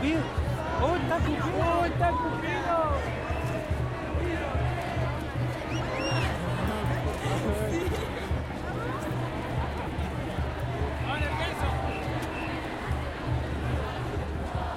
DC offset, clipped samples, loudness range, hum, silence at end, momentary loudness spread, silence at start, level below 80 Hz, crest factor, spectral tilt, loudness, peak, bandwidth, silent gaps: under 0.1%; under 0.1%; 4 LU; none; 0 s; 6 LU; 0 s; -38 dBFS; 18 dB; -6.5 dB/octave; -30 LUFS; -12 dBFS; 16 kHz; none